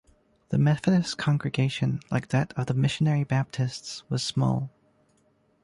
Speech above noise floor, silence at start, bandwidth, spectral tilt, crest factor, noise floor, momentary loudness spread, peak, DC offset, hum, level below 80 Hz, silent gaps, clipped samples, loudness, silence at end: 41 dB; 0.5 s; 11.5 kHz; -6 dB/octave; 16 dB; -66 dBFS; 7 LU; -10 dBFS; under 0.1%; none; -58 dBFS; none; under 0.1%; -26 LUFS; 0.95 s